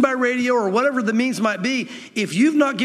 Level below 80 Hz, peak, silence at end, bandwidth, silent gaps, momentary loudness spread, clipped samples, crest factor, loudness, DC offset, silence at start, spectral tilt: -78 dBFS; -2 dBFS; 0 s; 13.5 kHz; none; 7 LU; under 0.1%; 16 dB; -20 LUFS; under 0.1%; 0 s; -4.5 dB/octave